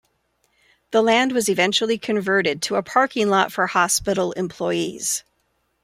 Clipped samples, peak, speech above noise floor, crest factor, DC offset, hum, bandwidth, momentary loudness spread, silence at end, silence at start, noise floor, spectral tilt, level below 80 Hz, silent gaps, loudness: under 0.1%; -4 dBFS; 49 dB; 18 dB; under 0.1%; none; 16 kHz; 6 LU; 0.65 s; 0.9 s; -69 dBFS; -3 dB/octave; -56 dBFS; none; -20 LUFS